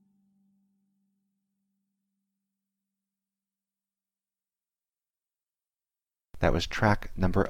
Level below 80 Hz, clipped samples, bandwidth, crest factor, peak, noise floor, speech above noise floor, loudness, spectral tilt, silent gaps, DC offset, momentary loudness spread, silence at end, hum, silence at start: -44 dBFS; under 0.1%; 15.5 kHz; 24 dB; -10 dBFS; under -90 dBFS; over 64 dB; -28 LUFS; -6 dB/octave; none; under 0.1%; 3 LU; 0 s; none; 6.35 s